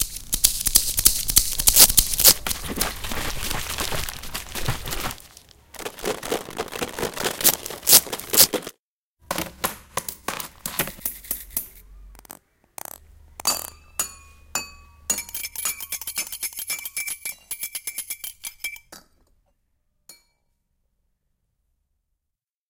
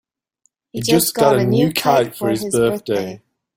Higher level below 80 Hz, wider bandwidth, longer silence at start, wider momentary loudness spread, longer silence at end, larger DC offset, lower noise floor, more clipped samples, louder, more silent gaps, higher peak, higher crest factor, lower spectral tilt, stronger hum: first, -40 dBFS vs -52 dBFS; about the same, 17.5 kHz vs 17 kHz; second, 0 s vs 0.75 s; first, 18 LU vs 9 LU; first, 2.55 s vs 0.4 s; neither; first, -84 dBFS vs -65 dBFS; neither; second, -21 LUFS vs -17 LUFS; first, 8.79-9.17 s vs none; about the same, 0 dBFS vs -2 dBFS; first, 26 dB vs 16 dB; second, -0.5 dB/octave vs -5 dB/octave; neither